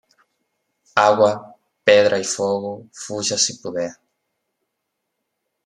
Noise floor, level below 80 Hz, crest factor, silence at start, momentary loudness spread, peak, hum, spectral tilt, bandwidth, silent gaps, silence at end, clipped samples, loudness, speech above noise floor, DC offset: -77 dBFS; -70 dBFS; 20 dB; 0.95 s; 16 LU; -2 dBFS; none; -2.5 dB/octave; 11 kHz; none; 1.75 s; under 0.1%; -18 LUFS; 59 dB; under 0.1%